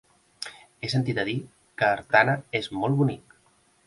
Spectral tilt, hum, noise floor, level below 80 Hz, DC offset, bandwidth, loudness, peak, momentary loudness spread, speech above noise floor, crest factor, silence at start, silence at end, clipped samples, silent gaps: -6 dB/octave; none; -63 dBFS; -62 dBFS; under 0.1%; 11.5 kHz; -25 LUFS; -4 dBFS; 18 LU; 38 dB; 22 dB; 0.4 s; 0.65 s; under 0.1%; none